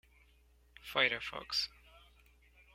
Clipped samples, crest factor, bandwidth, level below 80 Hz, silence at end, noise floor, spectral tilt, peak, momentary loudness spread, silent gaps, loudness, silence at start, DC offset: under 0.1%; 26 dB; 16.5 kHz; -66 dBFS; 0.75 s; -67 dBFS; -1.5 dB/octave; -14 dBFS; 11 LU; none; -34 LUFS; 0.85 s; under 0.1%